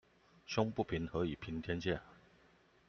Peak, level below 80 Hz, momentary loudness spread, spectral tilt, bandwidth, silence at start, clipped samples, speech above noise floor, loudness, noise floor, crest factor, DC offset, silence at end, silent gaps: -18 dBFS; -60 dBFS; 7 LU; -5 dB/octave; 7 kHz; 0.5 s; under 0.1%; 30 dB; -39 LUFS; -68 dBFS; 22 dB; under 0.1%; 0.75 s; none